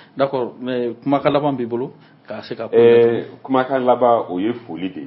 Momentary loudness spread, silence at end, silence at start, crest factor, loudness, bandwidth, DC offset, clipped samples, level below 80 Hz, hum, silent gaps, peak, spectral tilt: 15 LU; 0 s; 0.15 s; 18 dB; -18 LUFS; 5.8 kHz; under 0.1%; under 0.1%; -64 dBFS; none; none; 0 dBFS; -11.5 dB/octave